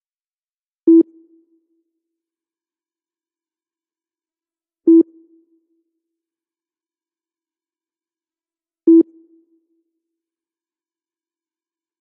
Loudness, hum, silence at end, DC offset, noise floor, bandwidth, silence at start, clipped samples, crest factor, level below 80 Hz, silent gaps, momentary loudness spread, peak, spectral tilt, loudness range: -15 LUFS; none; 3 s; under 0.1%; under -90 dBFS; 1.1 kHz; 0.85 s; under 0.1%; 18 dB; under -90 dBFS; none; 10 LU; -4 dBFS; -10 dB/octave; 1 LU